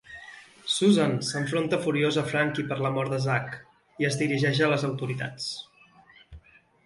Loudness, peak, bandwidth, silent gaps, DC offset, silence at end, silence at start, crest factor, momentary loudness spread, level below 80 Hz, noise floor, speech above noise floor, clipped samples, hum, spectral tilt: -26 LUFS; -10 dBFS; 11.5 kHz; none; under 0.1%; 0.45 s; 0.1 s; 18 dB; 16 LU; -62 dBFS; -56 dBFS; 30 dB; under 0.1%; none; -5 dB/octave